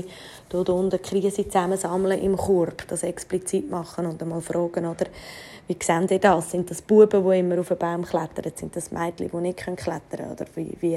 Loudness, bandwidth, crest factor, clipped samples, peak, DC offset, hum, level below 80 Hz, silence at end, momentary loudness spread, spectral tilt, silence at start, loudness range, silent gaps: -24 LUFS; 14.5 kHz; 20 dB; under 0.1%; -4 dBFS; under 0.1%; none; -54 dBFS; 0 s; 13 LU; -5.5 dB/octave; 0 s; 7 LU; none